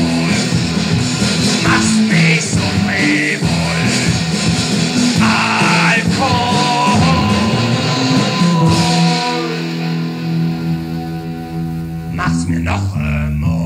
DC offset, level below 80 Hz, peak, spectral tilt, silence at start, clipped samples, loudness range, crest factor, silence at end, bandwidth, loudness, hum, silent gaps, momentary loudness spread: under 0.1%; -34 dBFS; -2 dBFS; -4.5 dB/octave; 0 s; under 0.1%; 7 LU; 12 dB; 0 s; 15 kHz; -14 LUFS; none; none; 8 LU